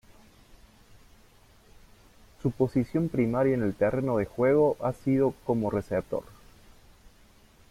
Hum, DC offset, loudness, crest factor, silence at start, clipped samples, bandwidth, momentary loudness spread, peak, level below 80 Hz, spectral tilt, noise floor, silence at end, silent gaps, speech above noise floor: none; under 0.1%; -27 LUFS; 16 dB; 2.45 s; under 0.1%; 15 kHz; 7 LU; -12 dBFS; -54 dBFS; -9 dB/octave; -57 dBFS; 1.5 s; none; 31 dB